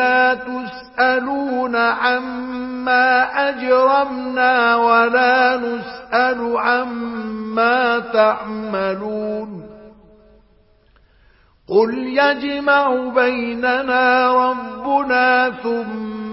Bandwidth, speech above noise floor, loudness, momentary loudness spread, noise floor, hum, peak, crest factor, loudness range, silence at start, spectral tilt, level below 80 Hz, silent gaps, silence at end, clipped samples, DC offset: 5.8 kHz; 37 dB; -17 LUFS; 12 LU; -54 dBFS; none; -2 dBFS; 16 dB; 7 LU; 0 s; -8.5 dB/octave; -56 dBFS; none; 0 s; under 0.1%; under 0.1%